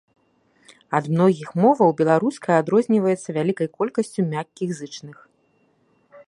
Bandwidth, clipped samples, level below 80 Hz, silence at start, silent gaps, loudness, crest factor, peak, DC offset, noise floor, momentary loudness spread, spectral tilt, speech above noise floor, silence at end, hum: 11.5 kHz; under 0.1%; -70 dBFS; 0.9 s; none; -21 LUFS; 20 dB; -2 dBFS; under 0.1%; -63 dBFS; 12 LU; -7 dB/octave; 43 dB; 0.1 s; none